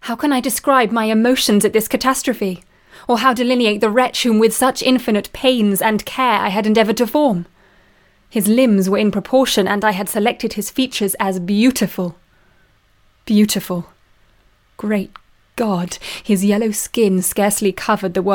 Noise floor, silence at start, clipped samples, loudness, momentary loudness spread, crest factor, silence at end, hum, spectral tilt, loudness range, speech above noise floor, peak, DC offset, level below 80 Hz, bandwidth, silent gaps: -55 dBFS; 0.05 s; under 0.1%; -16 LUFS; 9 LU; 16 dB; 0 s; none; -4.5 dB/octave; 6 LU; 39 dB; 0 dBFS; under 0.1%; -50 dBFS; 18 kHz; none